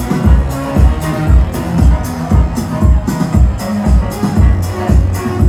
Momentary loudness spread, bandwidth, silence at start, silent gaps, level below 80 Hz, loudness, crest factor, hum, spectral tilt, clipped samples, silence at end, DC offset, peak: 4 LU; 15 kHz; 0 s; none; -14 dBFS; -13 LUFS; 10 dB; none; -7.5 dB/octave; 0.1%; 0 s; under 0.1%; 0 dBFS